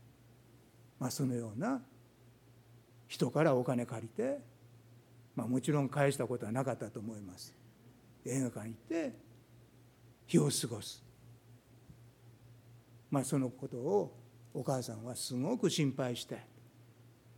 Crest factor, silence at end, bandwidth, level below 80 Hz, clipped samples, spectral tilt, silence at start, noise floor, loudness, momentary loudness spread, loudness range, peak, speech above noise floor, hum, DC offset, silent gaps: 22 dB; 0.05 s; 18 kHz; -76 dBFS; under 0.1%; -5.5 dB/octave; 1 s; -62 dBFS; -36 LUFS; 15 LU; 5 LU; -16 dBFS; 27 dB; none; under 0.1%; none